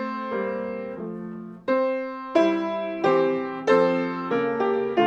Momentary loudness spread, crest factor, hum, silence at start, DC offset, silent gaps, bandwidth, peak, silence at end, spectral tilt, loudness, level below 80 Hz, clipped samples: 13 LU; 18 dB; none; 0 s; under 0.1%; none; 8.2 kHz; -6 dBFS; 0 s; -6.5 dB/octave; -24 LUFS; -68 dBFS; under 0.1%